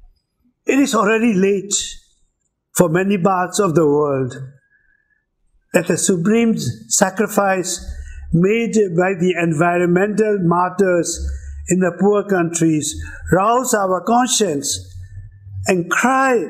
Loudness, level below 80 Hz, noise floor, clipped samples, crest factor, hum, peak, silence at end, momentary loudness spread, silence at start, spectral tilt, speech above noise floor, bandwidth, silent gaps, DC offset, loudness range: -17 LUFS; -38 dBFS; -67 dBFS; under 0.1%; 18 dB; none; 0 dBFS; 0 s; 11 LU; 0.65 s; -4.5 dB/octave; 51 dB; 16 kHz; none; under 0.1%; 2 LU